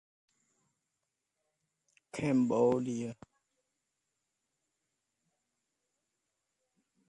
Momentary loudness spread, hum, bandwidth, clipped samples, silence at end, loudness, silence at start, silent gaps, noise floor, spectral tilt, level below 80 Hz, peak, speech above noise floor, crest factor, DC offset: 15 LU; none; 11 kHz; under 0.1%; 3.95 s; -31 LUFS; 2.15 s; none; -86 dBFS; -7 dB/octave; -76 dBFS; -16 dBFS; 56 dB; 22 dB; under 0.1%